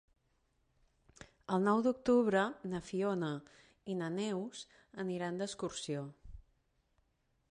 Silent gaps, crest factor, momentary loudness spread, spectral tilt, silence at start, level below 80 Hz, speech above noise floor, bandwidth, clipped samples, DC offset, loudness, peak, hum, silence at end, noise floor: none; 20 dB; 16 LU; -6 dB/octave; 1.5 s; -66 dBFS; 42 dB; 11.5 kHz; under 0.1%; under 0.1%; -36 LUFS; -18 dBFS; none; 1.1 s; -77 dBFS